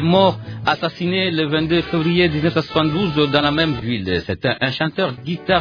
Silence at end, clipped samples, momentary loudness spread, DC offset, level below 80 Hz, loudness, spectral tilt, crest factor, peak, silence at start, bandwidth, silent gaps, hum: 0 s; under 0.1%; 6 LU; under 0.1%; -44 dBFS; -18 LUFS; -7.5 dB/octave; 16 dB; -2 dBFS; 0 s; 5.4 kHz; none; none